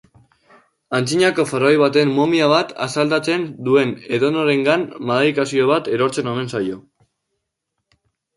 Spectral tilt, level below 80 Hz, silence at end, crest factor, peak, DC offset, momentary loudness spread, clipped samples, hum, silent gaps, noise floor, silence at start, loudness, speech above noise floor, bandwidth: -5 dB/octave; -62 dBFS; 1.55 s; 16 dB; -2 dBFS; under 0.1%; 8 LU; under 0.1%; none; none; -77 dBFS; 0.9 s; -18 LUFS; 60 dB; 11.5 kHz